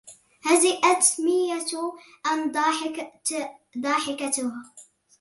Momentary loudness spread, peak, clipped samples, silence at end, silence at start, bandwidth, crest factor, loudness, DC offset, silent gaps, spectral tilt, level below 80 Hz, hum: 14 LU; -6 dBFS; under 0.1%; 0.4 s; 0.05 s; 12 kHz; 20 dB; -24 LUFS; under 0.1%; none; -0.5 dB/octave; -76 dBFS; none